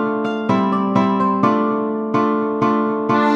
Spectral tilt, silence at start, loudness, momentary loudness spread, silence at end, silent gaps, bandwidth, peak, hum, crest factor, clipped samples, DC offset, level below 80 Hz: -8 dB/octave; 0 s; -18 LUFS; 4 LU; 0 s; none; 7.4 kHz; -2 dBFS; none; 16 dB; under 0.1%; under 0.1%; -62 dBFS